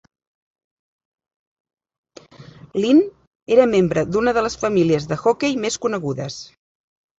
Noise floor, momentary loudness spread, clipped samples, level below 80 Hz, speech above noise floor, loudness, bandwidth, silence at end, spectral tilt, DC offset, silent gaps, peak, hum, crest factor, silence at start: -44 dBFS; 12 LU; under 0.1%; -52 dBFS; 25 dB; -19 LUFS; 8 kHz; 0.75 s; -5.5 dB/octave; under 0.1%; 3.27-3.46 s; -2 dBFS; none; 20 dB; 2.4 s